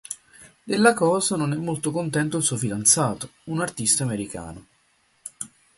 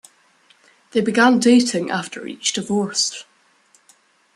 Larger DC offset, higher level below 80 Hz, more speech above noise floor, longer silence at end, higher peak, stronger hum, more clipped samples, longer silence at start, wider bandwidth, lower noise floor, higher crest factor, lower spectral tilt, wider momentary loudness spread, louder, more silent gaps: neither; first, -58 dBFS vs -68 dBFS; about the same, 41 dB vs 39 dB; second, 0.3 s vs 1.15 s; about the same, -2 dBFS vs -2 dBFS; neither; neither; second, 0.1 s vs 0.95 s; about the same, 12 kHz vs 12 kHz; first, -64 dBFS vs -57 dBFS; first, 24 dB vs 18 dB; about the same, -4 dB/octave vs -3.5 dB/octave; first, 18 LU vs 11 LU; second, -22 LUFS vs -18 LUFS; neither